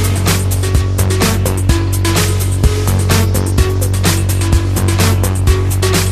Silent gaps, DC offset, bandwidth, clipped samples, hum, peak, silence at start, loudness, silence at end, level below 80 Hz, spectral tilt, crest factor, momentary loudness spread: none; under 0.1%; 14.5 kHz; under 0.1%; none; 0 dBFS; 0 s; -13 LUFS; 0 s; -20 dBFS; -5 dB/octave; 12 dB; 2 LU